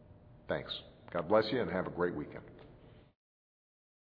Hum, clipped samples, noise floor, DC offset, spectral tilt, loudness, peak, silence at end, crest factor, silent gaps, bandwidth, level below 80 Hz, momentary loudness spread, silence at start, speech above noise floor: none; under 0.1%; -58 dBFS; under 0.1%; -4 dB/octave; -35 LUFS; -14 dBFS; 1.05 s; 24 dB; none; 5.2 kHz; -64 dBFS; 19 LU; 0 s; 24 dB